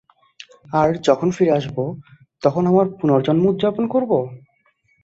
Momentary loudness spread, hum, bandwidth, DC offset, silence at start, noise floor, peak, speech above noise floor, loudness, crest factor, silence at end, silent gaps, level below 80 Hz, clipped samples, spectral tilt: 9 LU; none; 8 kHz; under 0.1%; 0.7 s; -62 dBFS; -2 dBFS; 45 dB; -19 LUFS; 18 dB; 0.65 s; none; -56 dBFS; under 0.1%; -7.5 dB/octave